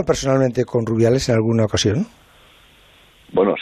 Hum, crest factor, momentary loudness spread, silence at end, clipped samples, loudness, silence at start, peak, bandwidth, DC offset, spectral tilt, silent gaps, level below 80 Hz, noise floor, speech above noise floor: none; 14 dB; 7 LU; 0 s; under 0.1%; -18 LUFS; 0 s; -4 dBFS; 13.5 kHz; under 0.1%; -5.5 dB/octave; none; -44 dBFS; -50 dBFS; 33 dB